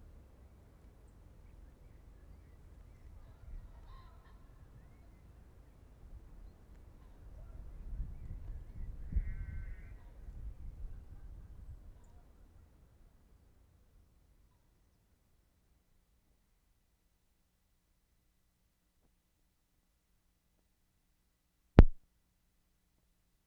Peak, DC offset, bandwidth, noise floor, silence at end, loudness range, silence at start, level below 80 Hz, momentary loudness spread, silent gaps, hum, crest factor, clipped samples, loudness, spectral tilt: -4 dBFS; under 0.1%; 5.2 kHz; -77 dBFS; 1.5 s; 24 LU; 1.6 s; -42 dBFS; 20 LU; none; none; 36 dB; under 0.1%; -36 LUFS; -9 dB/octave